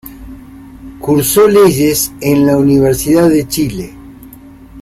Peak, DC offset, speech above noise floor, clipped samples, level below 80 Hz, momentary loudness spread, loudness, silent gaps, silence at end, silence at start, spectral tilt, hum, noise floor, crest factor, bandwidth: 0 dBFS; under 0.1%; 25 dB; under 0.1%; -36 dBFS; 15 LU; -10 LUFS; none; 0 s; 0.05 s; -5.5 dB/octave; none; -35 dBFS; 12 dB; 16 kHz